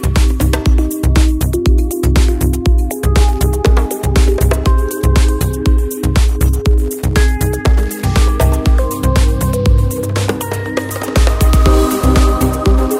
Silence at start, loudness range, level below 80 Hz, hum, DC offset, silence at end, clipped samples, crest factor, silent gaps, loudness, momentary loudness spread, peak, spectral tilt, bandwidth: 0 s; 1 LU; -14 dBFS; none; under 0.1%; 0 s; under 0.1%; 10 dB; none; -14 LUFS; 4 LU; 0 dBFS; -6 dB/octave; 16.5 kHz